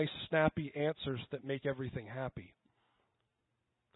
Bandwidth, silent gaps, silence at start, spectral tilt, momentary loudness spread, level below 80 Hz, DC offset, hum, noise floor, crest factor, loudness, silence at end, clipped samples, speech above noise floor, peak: 4 kHz; none; 0 s; -4.5 dB/octave; 11 LU; -64 dBFS; under 0.1%; none; -84 dBFS; 22 dB; -37 LUFS; 1.5 s; under 0.1%; 47 dB; -16 dBFS